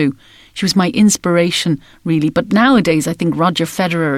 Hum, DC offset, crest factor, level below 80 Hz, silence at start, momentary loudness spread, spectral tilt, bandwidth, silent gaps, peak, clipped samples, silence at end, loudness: none; under 0.1%; 12 dB; -48 dBFS; 0 s; 8 LU; -5 dB/octave; 16 kHz; none; -4 dBFS; under 0.1%; 0 s; -14 LUFS